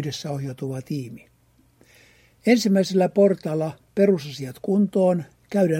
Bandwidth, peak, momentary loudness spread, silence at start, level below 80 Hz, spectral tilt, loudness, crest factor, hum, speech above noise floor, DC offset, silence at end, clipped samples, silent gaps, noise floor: 16 kHz; -4 dBFS; 13 LU; 0 s; -64 dBFS; -6.5 dB/octave; -22 LUFS; 18 dB; none; 37 dB; under 0.1%; 0 s; under 0.1%; none; -59 dBFS